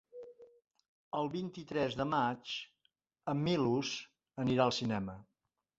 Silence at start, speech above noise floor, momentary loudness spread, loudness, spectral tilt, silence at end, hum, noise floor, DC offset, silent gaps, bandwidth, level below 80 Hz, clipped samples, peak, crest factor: 0.15 s; 52 dB; 20 LU; -36 LUFS; -4.5 dB/octave; 0.55 s; none; -86 dBFS; under 0.1%; 0.88-1.12 s; 7.8 kHz; -68 dBFS; under 0.1%; -16 dBFS; 20 dB